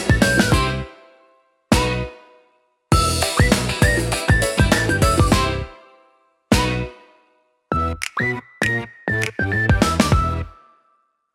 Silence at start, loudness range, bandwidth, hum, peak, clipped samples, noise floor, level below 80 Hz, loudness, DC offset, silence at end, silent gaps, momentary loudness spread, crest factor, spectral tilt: 0 s; 5 LU; 17 kHz; none; 0 dBFS; under 0.1%; -64 dBFS; -28 dBFS; -19 LUFS; under 0.1%; 0.85 s; none; 10 LU; 20 dB; -4.5 dB/octave